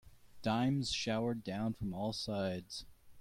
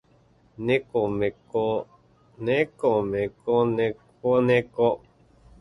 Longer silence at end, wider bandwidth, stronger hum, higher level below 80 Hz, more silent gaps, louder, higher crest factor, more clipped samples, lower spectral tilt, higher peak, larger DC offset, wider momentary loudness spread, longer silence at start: second, 0 s vs 0.65 s; first, 15.5 kHz vs 10 kHz; neither; second, -62 dBFS vs -56 dBFS; neither; second, -37 LUFS vs -25 LUFS; about the same, 16 dB vs 18 dB; neither; second, -5.5 dB/octave vs -8 dB/octave; second, -22 dBFS vs -6 dBFS; neither; about the same, 9 LU vs 9 LU; second, 0.05 s vs 0.6 s